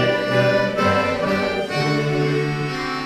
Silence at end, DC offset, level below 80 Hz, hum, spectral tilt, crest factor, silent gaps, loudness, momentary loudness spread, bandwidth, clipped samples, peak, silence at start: 0 s; under 0.1%; -48 dBFS; none; -6 dB/octave; 14 dB; none; -20 LUFS; 5 LU; 14 kHz; under 0.1%; -6 dBFS; 0 s